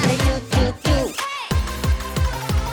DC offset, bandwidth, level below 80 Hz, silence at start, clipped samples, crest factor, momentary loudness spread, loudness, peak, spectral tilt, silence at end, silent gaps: under 0.1%; over 20 kHz; -26 dBFS; 0 s; under 0.1%; 16 dB; 4 LU; -22 LUFS; -4 dBFS; -5 dB/octave; 0 s; none